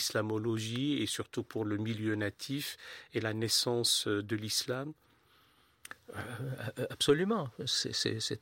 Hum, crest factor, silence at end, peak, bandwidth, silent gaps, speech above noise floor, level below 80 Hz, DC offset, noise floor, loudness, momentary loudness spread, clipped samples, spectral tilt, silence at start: none; 20 dB; 0.05 s; -16 dBFS; 16.5 kHz; none; 33 dB; -70 dBFS; under 0.1%; -67 dBFS; -33 LUFS; 12 LU; under 0.1%; -3.5 dB/octave; 0 s